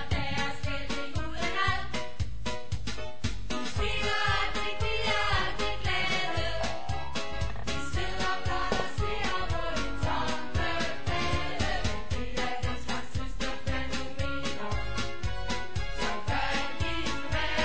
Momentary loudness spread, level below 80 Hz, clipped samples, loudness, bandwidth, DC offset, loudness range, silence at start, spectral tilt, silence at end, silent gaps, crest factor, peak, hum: 8 LU; -38 dBFS; under 0.1%; -32 LUFS; 8 kHz; 3%; 5 LU; 0 s; -4.5 dB/octave; 0 s; none; 18 dB; -12 dBFS; none